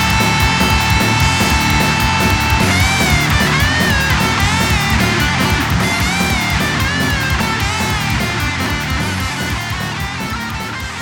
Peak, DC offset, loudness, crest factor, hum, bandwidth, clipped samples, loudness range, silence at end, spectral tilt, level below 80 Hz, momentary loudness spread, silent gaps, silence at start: 0 dBFS; under 0.1%; -14 LUFS; 14 dB; none; over 20 kHz; under 0.1%; 5 LU; 0 s; -4 dB/octave; -24 dBFS; 7 LU; none; 0 s